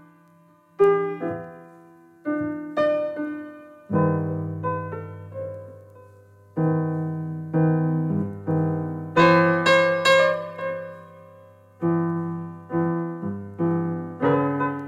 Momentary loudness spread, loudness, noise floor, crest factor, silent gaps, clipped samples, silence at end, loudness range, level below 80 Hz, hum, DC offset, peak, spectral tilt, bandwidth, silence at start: 17 LU; -23 LUFS; -56 dBFS; 18 dB; none; under 0.1%; 0 s; 8 LU; -64 dBFS; none; under 0.1%; -6 dBFS; -7 dB/octave; 11 kHz; 0.8 s